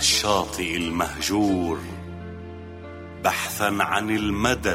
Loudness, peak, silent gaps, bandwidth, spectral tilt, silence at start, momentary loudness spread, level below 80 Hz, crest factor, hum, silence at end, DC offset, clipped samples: -23 LUFS; -6 dBFS; none; 16 kHz; -3 dB/octave; 0 s; 17 LU; -44 dBFS; 18 dB; none; 0 s; under 0.1%; under 0.1%